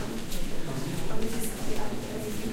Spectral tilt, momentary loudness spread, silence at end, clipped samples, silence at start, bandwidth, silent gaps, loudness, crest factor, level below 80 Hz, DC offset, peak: -4.5 dB/octave; 3 LU; 0 s; under 0.1%; 0 s; 16 kHz; none; -34 LUFS; 12 dB; -36 dBFS; under 0.1%; -14 dBFS